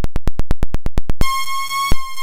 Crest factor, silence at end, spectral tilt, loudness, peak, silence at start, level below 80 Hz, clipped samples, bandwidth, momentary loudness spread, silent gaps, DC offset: 10 dB; 0 s; -4 dB/octave; -23 LUFS; -2 dBFS; 0 s; -20 dBFS; under 0.1%; 16 kHz; 6 LU; none; under 0.1%